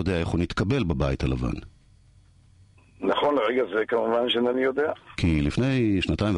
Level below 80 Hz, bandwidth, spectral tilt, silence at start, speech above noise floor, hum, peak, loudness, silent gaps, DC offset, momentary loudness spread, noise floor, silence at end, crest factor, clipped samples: -38 dBFS; 10.5 kHz; -7 dB/octave; 0 s; 31 dB; none; -10 dBFS; -25 LUFS; none; under 0.1%; 5 LU; -56 dBFS; 0 s; 14 dB; under 0.1%